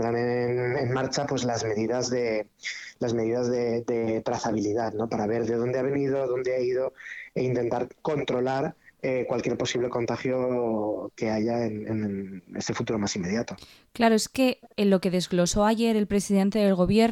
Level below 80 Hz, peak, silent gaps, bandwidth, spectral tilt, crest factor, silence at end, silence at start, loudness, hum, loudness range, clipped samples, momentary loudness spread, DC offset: -52 dBFS; -8 dBFS; none; 14.5 kHz; -5.5 dB/octave; 18 dB; 0 s; 0 s; -27 LUFS; none; 4 LU; under 0.1%; 9 LU; under 0.1%